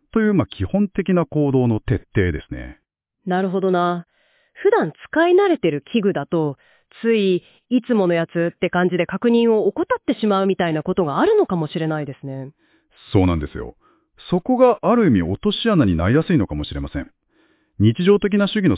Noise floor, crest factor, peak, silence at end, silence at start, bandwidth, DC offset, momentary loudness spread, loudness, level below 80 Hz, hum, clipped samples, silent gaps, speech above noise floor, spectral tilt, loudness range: -61 dBFS; 16 dB; -2 dBFS; 0 s; 0.15 s; 4 kHz; under 0.1%; 14 LU; -19 LUFS; -38 dBFS; none; under 0.1%; none; 42 dB; -11.5 dB/octave; 3 LU